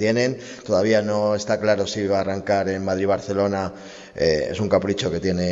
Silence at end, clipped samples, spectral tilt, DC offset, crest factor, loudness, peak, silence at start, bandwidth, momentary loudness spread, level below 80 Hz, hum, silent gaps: 0 s; under 0.1%; -5.5 dB/octave; under 0.1%; 16 dB; -22 LUFS; -4 dBFS; 0 s; 8 kHz; 5 LU; -50 dBFS; none; none